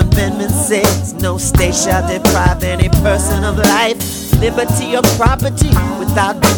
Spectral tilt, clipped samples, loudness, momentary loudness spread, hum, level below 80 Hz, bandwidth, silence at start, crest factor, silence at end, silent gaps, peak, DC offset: -4.5 dB/octave; under 0.1%; -13 LUFS; 4 LU; none; -20 dBFS; over 20 kHz; 0 s; 12 dB; 0 s; none; 0 dBFS; under 0.1%